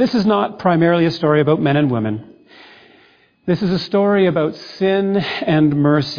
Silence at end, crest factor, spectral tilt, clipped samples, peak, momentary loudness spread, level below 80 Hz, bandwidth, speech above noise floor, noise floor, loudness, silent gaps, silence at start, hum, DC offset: 0 s; 14 dB; -8 dB/octave; under 0.1%; -2 dBFS; 7 LU; -54 dBFS; 5.2 kHz; 37 dB; -52 dBFS; -16 LUFS; none; 0 s; none; under 0.1%